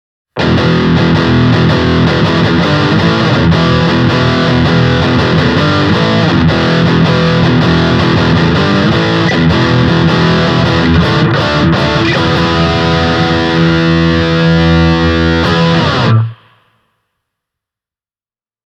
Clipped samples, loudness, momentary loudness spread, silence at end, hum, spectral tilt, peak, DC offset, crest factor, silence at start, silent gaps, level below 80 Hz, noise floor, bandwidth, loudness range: under 0.1%; -9 LUFS; 1 LU; 2.3 s; none; -7 dB/octave; 0 dBFS; under 0.1%; 10 dB; 0.35 s; none; -28 dBFS; under -90 dBFS; 8.2 kHz; 1 LU